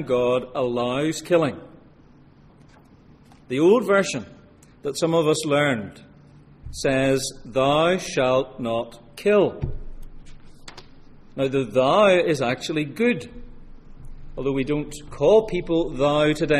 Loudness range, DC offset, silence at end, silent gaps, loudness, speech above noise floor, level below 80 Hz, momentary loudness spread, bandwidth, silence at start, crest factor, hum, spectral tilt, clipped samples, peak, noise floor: 3 LU; under 0.1%; 0 s; none; -22 LUFS; 30 dB; -42 dBFS; 14 LU; 14.5 kHz; 0 s; 18 dB; none; -5 dB/octave; under 0.1%; -6 dBFS; -51 dBFS